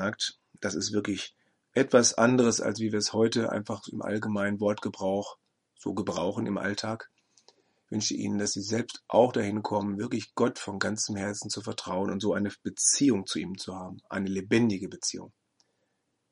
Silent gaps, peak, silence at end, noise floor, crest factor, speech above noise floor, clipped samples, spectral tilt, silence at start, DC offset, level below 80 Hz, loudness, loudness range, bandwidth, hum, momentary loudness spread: none; -6 dBFS; 1.05 s; -77 dBFS; 22 dB; 49 dB; under 0.1%; -4 dB/octave; 0 s; under 0.1%; -70 dBFS; -29 LUFS; 6 LU; 11.5 kHz; none; 13 LU